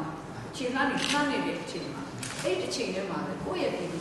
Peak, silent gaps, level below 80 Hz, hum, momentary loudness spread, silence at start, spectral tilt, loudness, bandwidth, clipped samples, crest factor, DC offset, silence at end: -12 dBFS; none; -58 dBFS; none; 10 LU; 0 s; -4 dB/octave; -31 LUFS; 12 kHz; under 0.1%; 20 dB; under 0.1%; 0 s